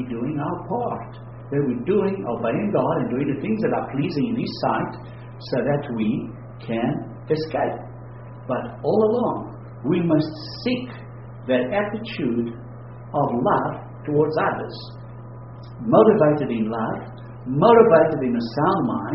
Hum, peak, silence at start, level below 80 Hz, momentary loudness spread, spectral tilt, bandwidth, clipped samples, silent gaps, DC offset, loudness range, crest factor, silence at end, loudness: none; 0 dBFS; 0 s; -52 dBFS; 20 LU; -6.5 dB/octave; 6 kHz; under 0.1%; none; under 0.1%; 7 LU; 22 dB; 0 s; -22 LUFS